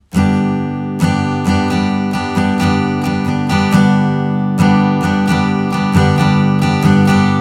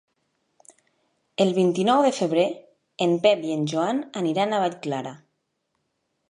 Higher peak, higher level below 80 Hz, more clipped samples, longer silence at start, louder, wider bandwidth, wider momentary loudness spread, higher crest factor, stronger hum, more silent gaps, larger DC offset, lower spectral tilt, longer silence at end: first, 0 dBFS vs -6 dBFS; first, -42 dBFS vs -76 dBFS; neither; second, 0.15 s vs 1.4 s; first, -14 LUFS vs -23 LUFS; first, 13.5 kHz vs 11 kHz; second, 5 LU vs 11 LU; second, 12 dB vs 20 dB; neither; neither; neither; first, -7 dB/octave vs -5.5 dB/octave; second, 0 s vs 1.15 s